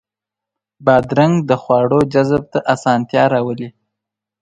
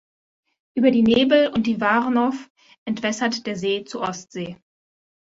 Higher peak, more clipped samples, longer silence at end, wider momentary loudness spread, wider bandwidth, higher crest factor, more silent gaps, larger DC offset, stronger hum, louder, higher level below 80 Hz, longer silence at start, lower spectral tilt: first, 0 dBFS vs -6 dBFS; neither; about the same, 0.7 s vs 0.7 s; second, 6 LU vs 17 LU; first, 10.5 kHz vs 8 kHz; about the same, 16 dB vs 16 dB; second, none vs 2.50-2.55 s, 2.78-2.86 s; neither; neither; first, -15 LUFS vs -21 LUFS; first, -50 dBFS vs -58 dBFS; about the same, 0.8 s vs 0.75 s; first, -7 dB/octave vs -5 dB/octave